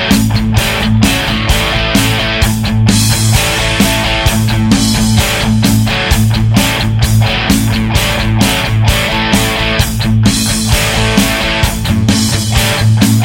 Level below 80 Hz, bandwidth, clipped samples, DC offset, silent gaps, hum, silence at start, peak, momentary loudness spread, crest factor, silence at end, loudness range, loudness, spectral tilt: -20 dBFS; 17 kHz; under 0.1%; 0.1%; none; none; 0 s; 0 dBFS; 2 LU; 10 dB; 0 s; 1 LU; -11 LUFS; -4.5 dB/octave